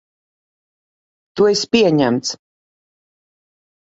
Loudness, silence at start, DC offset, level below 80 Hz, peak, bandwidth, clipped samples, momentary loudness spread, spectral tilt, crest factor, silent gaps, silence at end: -16 LUFS; 1.35 s; under 0.1%; -60 dBFS; -2 dBFS; 8 kHz; under 0.1%; 17 LU; -4.5 dB/octave; 20 dB; none; 1.45 s